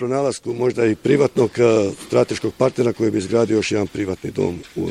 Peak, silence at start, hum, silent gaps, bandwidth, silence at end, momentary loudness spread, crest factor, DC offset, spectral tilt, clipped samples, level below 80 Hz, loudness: -2 dBFS; 0 s; none; none; 13.5 kHz; 0 s; 8 LU; 16 dB; under 0.1%; -6 dB/octave; under 0.1%; -52 dBFS; -19 LUFS